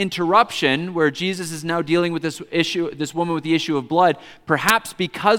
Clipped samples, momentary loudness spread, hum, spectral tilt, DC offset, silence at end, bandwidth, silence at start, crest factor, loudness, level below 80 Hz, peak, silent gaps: under 0.1%; 7 LU; none; -4.5 dB/octave; under 0.1%; 0 s; 17 kHz; 0 s; 20 dB; -20 LUFS; -60 dBFS; 0 dBFS; none